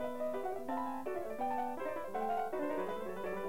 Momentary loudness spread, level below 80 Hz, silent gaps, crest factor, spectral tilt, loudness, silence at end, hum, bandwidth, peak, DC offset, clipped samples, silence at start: 4 LU; -70 dBFS; none; 12 dB; -6 dB/octave; -39 LUFS; 0 s; none; 16 kHz; -26 dBFS; 0.4%; under 0.1%; 0 s